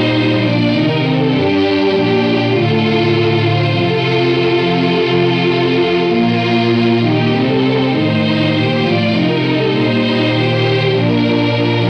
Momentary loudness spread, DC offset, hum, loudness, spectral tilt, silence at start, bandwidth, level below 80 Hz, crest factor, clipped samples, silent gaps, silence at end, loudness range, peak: 1 LU; under 0.1%; none; -13 LUFS; -7.5 dB/octave; 0 s; 8.2 kHz; -50 dBFS; 10 dB; under 0.1%; none; 0 s; 1 LU; -2 dBFS